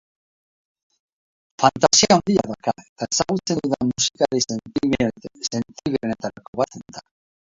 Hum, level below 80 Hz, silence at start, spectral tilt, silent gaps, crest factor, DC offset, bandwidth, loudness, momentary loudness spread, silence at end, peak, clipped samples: none; -54 dBFS; 1.6 s; -3.5 dB/octave; 2.89-2.96 s, 6.48-6.53 s; 22 dB; under 0.1%; 7.8 kHz; -21 LUFS; 14 LU; 0.55 s; 0 dBFS; under 0.1%